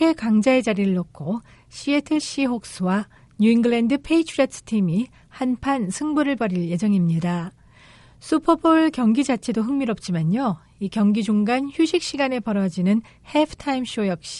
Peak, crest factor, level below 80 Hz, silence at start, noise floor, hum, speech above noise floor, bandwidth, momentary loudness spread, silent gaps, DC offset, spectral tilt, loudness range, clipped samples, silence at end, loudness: -4 dBFS; 16 dB; -54 dBFS; 0 s; -49 dBFS; none; 28 dB; 11.5 kHz; 9 LU; none; under 0.1%; -6 dB/octave; 2 LU; under 0.1%; 0 s; -22 LUFS